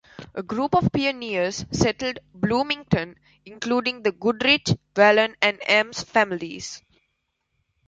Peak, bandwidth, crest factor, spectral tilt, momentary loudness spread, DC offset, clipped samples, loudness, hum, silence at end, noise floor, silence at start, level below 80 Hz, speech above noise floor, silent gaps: -4 dBFS; 9.4 kHz; 20 dB; -4.5 dB/octave; 15 LU; under 0.1%; under 0.1%; -22 LUFS; none; 1.1 s; -75 dBFS; 0.2 s; -50 dBFS; 52 dB; none